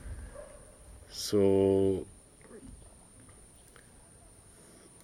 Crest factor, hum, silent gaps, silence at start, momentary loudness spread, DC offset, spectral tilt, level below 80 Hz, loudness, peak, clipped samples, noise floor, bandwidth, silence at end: 18 dB; none; none; 0.05 s; 28 LU; under 0.1%; -6 dB/octave; -54 dBFS; -28 LUFS; -16 dBFS; under 0.1%; -56 dBFS; 15.5 kHz; 2.3 s